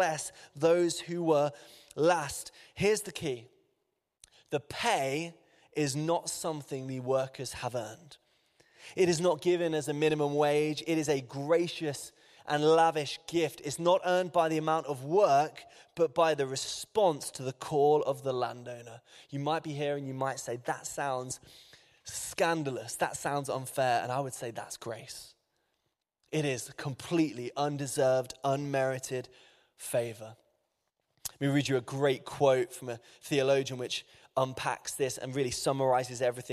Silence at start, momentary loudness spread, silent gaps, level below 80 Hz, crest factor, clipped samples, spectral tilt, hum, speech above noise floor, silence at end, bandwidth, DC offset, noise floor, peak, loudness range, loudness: 0 s; 14 LU; none; -68 dBFS; 18 dB; under 0.1%; -4.5 dB/octave; none; 51 dB; 0 s; 15 kHz; under 0.1%; -82 dBFS; -12 dBFS; 6 LU; -31 LUFS